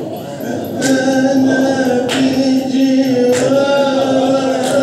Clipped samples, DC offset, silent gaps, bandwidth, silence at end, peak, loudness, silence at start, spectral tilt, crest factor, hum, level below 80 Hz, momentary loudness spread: under 0.1%; under 0.1%; none; 13.5 kHz; 0 s; -2 dBFS; -13 LUFS; 0 s; -4.5 dB/octave; 12 dB; none; -60 dBFS; 7 LU